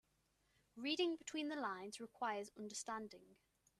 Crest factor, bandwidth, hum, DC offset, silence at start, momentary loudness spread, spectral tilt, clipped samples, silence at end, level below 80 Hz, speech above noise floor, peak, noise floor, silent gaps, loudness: 20 dB; 13.5 kHz; none; under 0.1%; 0.75 s; 13 LU; -2.5 dB/octave; under 0.1%; 0.45 s; -86 dBFS; 36 dB; -28 dBFS; -81 dBFS; none; -45 LUFS